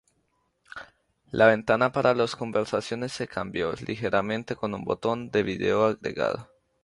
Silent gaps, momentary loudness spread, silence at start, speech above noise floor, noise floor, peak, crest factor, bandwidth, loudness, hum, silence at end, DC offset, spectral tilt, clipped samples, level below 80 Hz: none; 12 LU; 0.75 s; 47 dB; -72 dBFS; -4 dBFS; 22 dB; 11.5 kHz; -26 LUFS; none; 0.4 s; under 0.1%; -5.5 dB/octave; under 0.1%; -58 dBFS